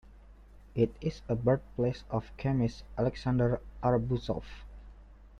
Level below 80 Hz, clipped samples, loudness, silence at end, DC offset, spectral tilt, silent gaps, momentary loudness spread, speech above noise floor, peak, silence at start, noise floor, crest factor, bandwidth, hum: -48 dBFS; under 0.1%; -32 LUFS; 0 s; under 0.1%; -8.5 dB/octave; none; 9 LU; 23 dB; -14 dBFS; 0.15 s; -53 dBFS; 20 dB; 7.2 kHz; 50 Hz at -50 dBFS